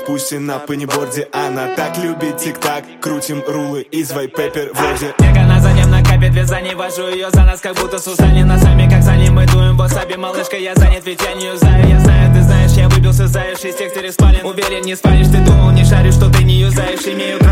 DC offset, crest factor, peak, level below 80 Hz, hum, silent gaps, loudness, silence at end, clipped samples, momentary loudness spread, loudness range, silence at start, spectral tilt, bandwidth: under 0.1%; 10 dB; 0 dBFS; -16 dBFS; none; none; -12 LUFS; 0 s; under 0.1%; 11 LU; 8 LU; 0 s; -6 dB/octave; 16 kHz